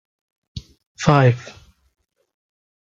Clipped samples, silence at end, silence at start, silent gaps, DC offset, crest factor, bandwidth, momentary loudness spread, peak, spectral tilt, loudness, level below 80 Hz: under 0.1%; 1.4 s; 0.55 s; 0.86-0.95 s; under 0.1%; 20 dB; 7.6 kHz; 24 LU; -2 dBFS; -6.5 dB/octave; -17 LUFS; -50 dBFS